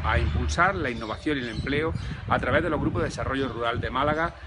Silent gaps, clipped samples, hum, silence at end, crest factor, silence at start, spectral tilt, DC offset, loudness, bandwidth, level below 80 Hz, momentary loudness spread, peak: none; under 0.1%; none; 0 s; 20 dB; 0 s; -6 dB/octave; under 0.1%; -26 LUFS; 10.5 kHz; -36 dBFS; 6 LU; -6 dBFS